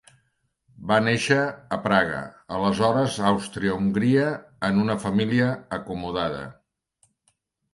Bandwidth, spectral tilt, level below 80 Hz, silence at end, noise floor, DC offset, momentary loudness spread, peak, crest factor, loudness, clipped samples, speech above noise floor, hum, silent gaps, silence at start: 11.5 kHz; -6 dB/octave; -54 dBFS; 1.2 s; -71 dBFS; under 0.1%; 11 LU; -4 dBFS; 20 dB; -24 LUFS; under 0.1%; 48 dB; none; none; 0.8 s